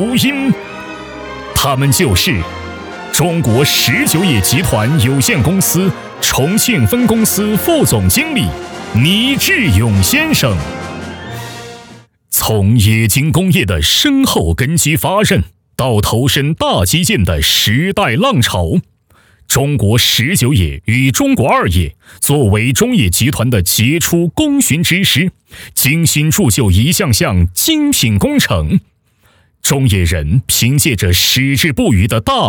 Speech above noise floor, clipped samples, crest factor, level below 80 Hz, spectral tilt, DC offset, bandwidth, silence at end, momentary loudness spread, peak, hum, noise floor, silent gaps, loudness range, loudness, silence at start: 41 dB; under 0.1%; 12 dB; -30 dBFS; -4 dB/octave; under 0.1%; over 20 kHz; 0 s; 8 LU; 0 dBFS; none; -52 dBFS; none; 2 LU; -12 LUFS; 0 s